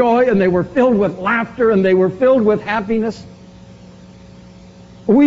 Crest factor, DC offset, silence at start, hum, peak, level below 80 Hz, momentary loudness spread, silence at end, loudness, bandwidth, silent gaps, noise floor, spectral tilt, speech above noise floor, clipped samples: 12 dB; under 0.1%; 0 s; none; -2 dBFS; -48 dBFS; 7 LU; 0 s; -15 LUFS; 7.6 kHz; none; -40 dBFS; -6 dB/octave; 25 dB; under 0.1%